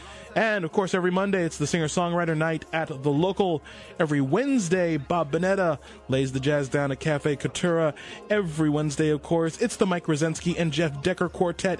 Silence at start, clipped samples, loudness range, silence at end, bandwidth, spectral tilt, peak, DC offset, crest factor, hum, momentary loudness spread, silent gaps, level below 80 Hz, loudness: 0 s; under 0.1%; 1 LU; 0 s; 11.5 kHz; -5.5 dB/octave; -8 dBFS; under 0.1%; 16 dB; none; 4 LU; none; -54 dBFS; -25 LUFS